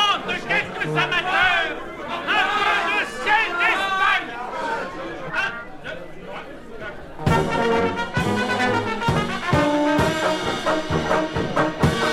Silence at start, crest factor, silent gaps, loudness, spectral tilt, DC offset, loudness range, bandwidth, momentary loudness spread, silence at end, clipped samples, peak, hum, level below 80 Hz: 0 s; 18 dB; none; -21 LUFS; -5 dB/octave; under 0.1%; 6 LU; 15.5 kHz; 15 LU; 0 s; under 0.1%; -4 dBFS; none; -44 dBFS